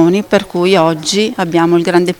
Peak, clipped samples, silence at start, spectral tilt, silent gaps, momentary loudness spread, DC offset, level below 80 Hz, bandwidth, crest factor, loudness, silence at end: 0 dBFS; under 0.1%; 0 s; -5 dB/octave; none; 3 LU; under 0.1%; -50 dBFS; 17.5 kHz; 12 dB; -12 LUFS; 0.05 s